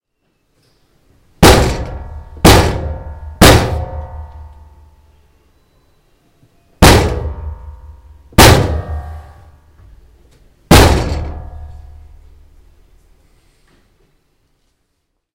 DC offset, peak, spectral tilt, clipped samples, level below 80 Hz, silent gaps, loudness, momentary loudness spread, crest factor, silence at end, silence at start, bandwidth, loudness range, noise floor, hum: under 0.1%; 0 dBFS; -4.5 dB/octave; 0.9%; -22 dBFS; none; -10 LUFS; 25 LU; 14 dB; 3.55 s; 1.4 s; over 20 kHz; 5 LU; -68 dBFS; none